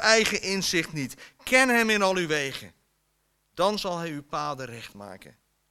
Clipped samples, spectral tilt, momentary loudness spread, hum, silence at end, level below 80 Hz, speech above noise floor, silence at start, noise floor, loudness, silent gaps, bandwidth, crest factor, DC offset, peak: under 0.1%; -3 dB/octave; 20 LU; none; 0.55 s; -58 dBFS; 46 dB; 0 s; -72 dBFS; -25 LUFS; none; 16.5 kHz; 24 dB; under 0.1%; -2 dBFS